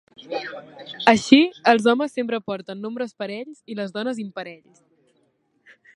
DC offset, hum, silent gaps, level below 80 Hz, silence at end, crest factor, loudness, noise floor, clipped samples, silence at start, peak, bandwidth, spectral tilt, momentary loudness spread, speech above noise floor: under 0.1%; none; none; -68 dBFS; 1.4 s; 22 dB; -21 LUFS; -66 dBFS; under 0.1%; 0.2 s; 0 dBFS; 11 kHz; -4.5 dB/octave; 20 LU; 45 dB